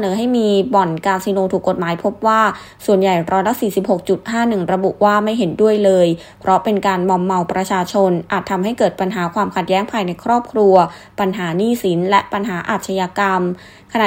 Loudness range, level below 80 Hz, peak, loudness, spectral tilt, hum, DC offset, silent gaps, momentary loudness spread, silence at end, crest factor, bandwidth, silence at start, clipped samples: 2 LU; -54 dBFS; 0 dBFS; -16 LUFS; -6 dB/octave; none; under 0.1%; none; 6 LU; 0 s; 16 dB; 16 kHz; 0 s; under 0.1%